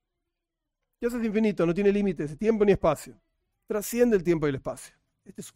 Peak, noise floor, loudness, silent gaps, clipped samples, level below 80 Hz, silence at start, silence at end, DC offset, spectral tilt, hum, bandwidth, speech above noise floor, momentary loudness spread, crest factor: -10 dBFS; -85 dBFS; -26 LUFS; none; under 0.1%; -52 dBFS; 1 s; 0.05 s; under 0.1%; -6.5 dB/octave; none; 16 kHz; 59 dB; 13 LU; 16 dB